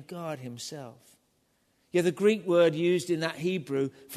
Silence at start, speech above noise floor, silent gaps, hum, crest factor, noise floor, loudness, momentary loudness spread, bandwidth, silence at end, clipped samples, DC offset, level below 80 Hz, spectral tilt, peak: 0 s; 43 dB; none; none; 16 dB; -71 dBFS; -28 LUFS; 15 LU; 13.5 kHz; 0 s; under 0.1%; under 0.1%; -76 dBFS; -5.5 dB/octave; -12 dBFS